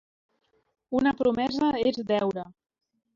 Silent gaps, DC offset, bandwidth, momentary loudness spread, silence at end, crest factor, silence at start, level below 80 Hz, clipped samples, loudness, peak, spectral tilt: none; under 0.1%; 7.6 kHz; 8 LU; 0.65 s; 16 dB; 0.9 s; -60 dBFS; under 0.1%; -26 LUFS; -12 dBFS; -6.5 dB/octave